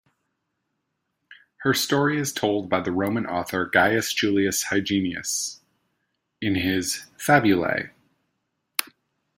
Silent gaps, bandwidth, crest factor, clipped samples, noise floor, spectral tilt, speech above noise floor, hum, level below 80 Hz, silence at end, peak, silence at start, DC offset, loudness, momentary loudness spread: none; 16.5 kHz; 26 dB; under 0.1%; -78 dBFS; -4 dB/octave; 55 dB; none; -60 dBFS; 0.5 s; 0 dBFS; 1.3 s; under 0.1%; -23 LUFS; 10 LU